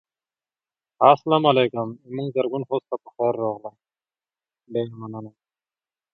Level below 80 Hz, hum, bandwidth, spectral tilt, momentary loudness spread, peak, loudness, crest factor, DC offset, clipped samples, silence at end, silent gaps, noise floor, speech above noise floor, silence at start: -72 dBFS; none; 6 kHz; -8.5 dB/octave; 18 LU; 0 dBFS; -22 LUFS; 24 dB; under 0.1%; under 0.1%; 0.85 s; none; under -90 dBFS; over 68 dB; 1 s